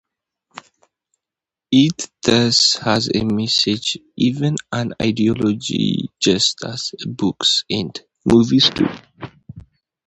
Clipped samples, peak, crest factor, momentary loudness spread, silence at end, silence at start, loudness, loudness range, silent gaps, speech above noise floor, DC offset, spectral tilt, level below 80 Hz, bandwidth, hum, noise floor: under 0.1%; 0 dBFS; 18 dB; 11 LU; 0.45 s; 1.7 s; -17 LUFS; 3 LU; none; 70 dB; under 0.1%; -4 dB/octave; -50 dBFS; 10.5 kHz; none; -87 dBFS